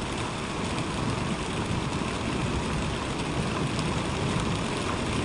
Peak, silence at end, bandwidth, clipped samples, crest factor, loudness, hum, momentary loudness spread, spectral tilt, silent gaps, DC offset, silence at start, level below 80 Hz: -14 dBFS; 0 s; 11.5 kHz; under 0.1%; 16 dB; -29 LUFS; none; 2 LU; -5 dB/octave; none; under 0.1%; 0 s; -40 dBFS